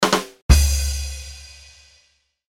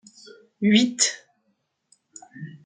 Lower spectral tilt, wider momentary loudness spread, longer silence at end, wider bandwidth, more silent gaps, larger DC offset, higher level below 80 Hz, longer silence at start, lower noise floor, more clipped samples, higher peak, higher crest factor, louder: about the same, -4 dB/octave vs -3 dB/octave; about the same, 22 LU vs 23 LU; first, 1.05 s vs 0.1 s; first, 16.5 kHz vs 9.6 kHz; first, 0.42-0.49 s vs none; neither; first, -22 dBFS vs -74 dBFS; second, 0 s vs 0.6 s; second, -62 dBFS vs -72 dBFS; neither; first, 0 dBFS vs -6 dBFS; about the same, 20 dB vs 20 dB; about the same, -20 LUFS vs -21 LUFS